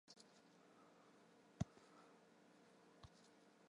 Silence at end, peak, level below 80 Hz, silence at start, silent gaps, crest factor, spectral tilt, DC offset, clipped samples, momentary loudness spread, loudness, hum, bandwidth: 0 s; -30 dBFS; -74 dBFS; 0.05 s; none; 30 dB; -6 dB/octave; under 0.1%; under 0.1%; 18 LU; -57 LUFS; none; 11 kHz